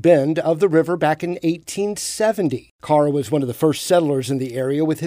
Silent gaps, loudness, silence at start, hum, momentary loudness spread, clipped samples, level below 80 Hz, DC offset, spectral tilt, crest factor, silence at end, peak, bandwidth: 2.71-2.79 s; -19 LUFS; 0.05 s; none; 7 LU; under 0.1%; -60 dBFS; under 0.1%; -5.5 dB/octave; 16 dB; 0 s; -2 dBFS; 16 kHz